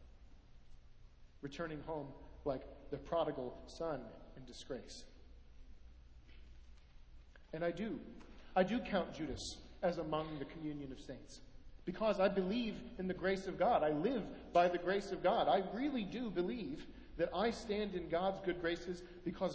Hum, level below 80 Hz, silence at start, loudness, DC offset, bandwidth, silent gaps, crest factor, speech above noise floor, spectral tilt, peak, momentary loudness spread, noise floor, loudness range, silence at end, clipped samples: none; -60 dBFS; 0 s; -39 LUFS; under 0.1%; 8 kHz; none; 20 dB; 20 dB; -6 dB/octave; -20 dBFS; 17 LU; -59 dBFS; 13 LU; 0 s; under 0.1%